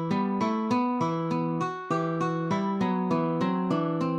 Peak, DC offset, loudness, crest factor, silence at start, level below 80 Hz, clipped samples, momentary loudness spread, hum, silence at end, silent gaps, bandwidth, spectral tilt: -14 dBFS; under 0.1%; -27 LUFS; 14 dB; 0 s; -70 dBFS; under 0.1%; 2 LU; none; 0 s; none; 8.8 kHz; -7.5 dB/octave